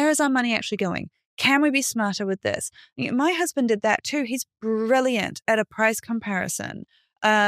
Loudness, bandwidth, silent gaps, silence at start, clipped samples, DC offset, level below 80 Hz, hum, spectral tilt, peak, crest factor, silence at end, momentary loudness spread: -23 LUFS; 15.5 kHz; 1.26-1.37 s; 0 s; under 0.1%; under 0.1%; -64 dBFS; none; -3.5 dB/octave; -4 dBFS; 18 dB; 0 s; 10 LU